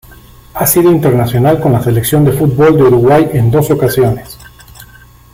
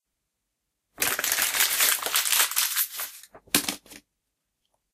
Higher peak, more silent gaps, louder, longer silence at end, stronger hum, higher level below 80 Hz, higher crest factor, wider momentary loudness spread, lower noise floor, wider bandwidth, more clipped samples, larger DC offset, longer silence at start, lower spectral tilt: about the same, 0 dBFS vs 0 dBFS; neither; first, -9 LUFS vs -23 LUFS; second, 0.5 s vs 0.95 s; neither; first, -36 dBFS vs -66 dBFS; second, 10 dB vs 28 dB; second, 5 LU vs 12 LU; second, -38 dBFS vs -81 dBFS; about the same, 16.5 kHz vs 16 kHz; neither; neither; second, 0.55 s vs 1 s; first, -6.5 dB/octave vs 1 dB/octave